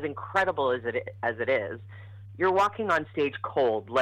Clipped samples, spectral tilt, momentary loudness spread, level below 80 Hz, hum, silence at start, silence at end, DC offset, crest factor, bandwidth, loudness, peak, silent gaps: under 0.1%; -6 dB/octave; 14 LU; -66 dBFS; none; 0 s; 0 s; under 0.1%; 16 dB; 14 kHz; -27 LUFS; -10 dBFS; none